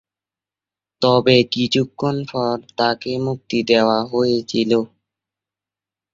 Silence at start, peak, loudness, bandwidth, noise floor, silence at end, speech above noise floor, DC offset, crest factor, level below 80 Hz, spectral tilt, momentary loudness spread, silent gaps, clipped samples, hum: 1 s; -2 dBFS; -18 LUFS; 7.6 kHz; -89 dBFS; 1.25 s; 72 dB; under 0.1%; 18 dB; -58 dBFS; -6 dB/octave; 8 LU; none; under 0.1%; none